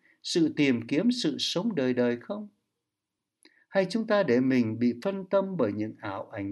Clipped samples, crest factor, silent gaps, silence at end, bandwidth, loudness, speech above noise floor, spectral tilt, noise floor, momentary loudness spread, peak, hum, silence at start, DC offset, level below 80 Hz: under 0.1%; 16 dB; none; 0 s; 12 kHz; -27 LUFS; 60 dB; -5.5 dB/octave; -87 dBFS; 11 LU; -12 dBFS; none; 0.25 s; under 0.1%; -74 dBFS